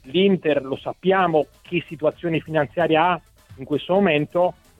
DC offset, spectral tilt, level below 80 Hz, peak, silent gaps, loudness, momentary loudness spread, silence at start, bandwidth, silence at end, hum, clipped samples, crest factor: under 0.1%; -7.5 dB/octave; -56 dBFS; -4 dBFS; none; -21 LUFS; 9 LU; 0.05 s; 10 kHz; 0.25 s; none; under 0.1%; 18 dB